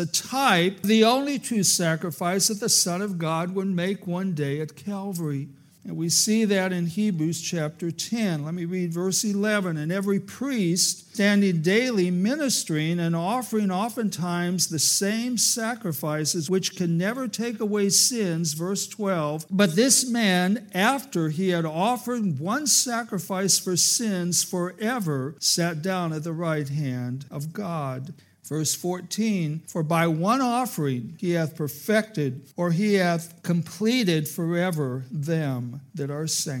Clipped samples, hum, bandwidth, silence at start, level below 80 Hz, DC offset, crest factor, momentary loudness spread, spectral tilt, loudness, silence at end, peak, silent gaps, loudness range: under 0.1%; none; 17 kHz; 0 s; -78 dBFS; under 0.1%; 20 dB; 10 LU; -4 dB/octave; -24 LUFS; 0 s; -4 dBFS; none; 4 LU